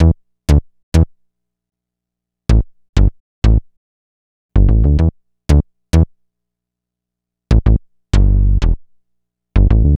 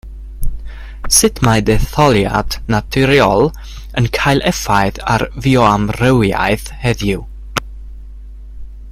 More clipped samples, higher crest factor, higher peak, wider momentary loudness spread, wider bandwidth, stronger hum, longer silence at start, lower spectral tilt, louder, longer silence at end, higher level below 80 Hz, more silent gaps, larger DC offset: neither; about the same, 14 dB vs 14 dB; about the same, 0 dBFS vs 0 dBFS; second, 8 LU vs 18 LU; second, 9 kHz vs 16 kHz; first, 60 Hz at -40 dBFS vs none; about the same, 0 s vs 0.05 s; first, -8 dB/octave vs -4.5 dB/octave; about the same, -16 LUFS vs -14 LUFS; about the same, 0 s vs 0 s; first, -16 dBFS vs -26 dBFS; first, 0.83-0.92 s, 2.89-2.93 s, 3.20-3.42 s, 3.77-4.49 s vs none; neither